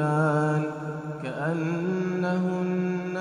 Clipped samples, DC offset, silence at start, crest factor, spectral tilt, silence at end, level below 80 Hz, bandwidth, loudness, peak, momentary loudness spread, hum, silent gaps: under 0.1%; under 0.1%; 0 s; 14 dB; -8 dB/octave; 0 s; -68 dBFS; 10 kHz; -27 LUFS; -12 dBFS; 10 LU; none; none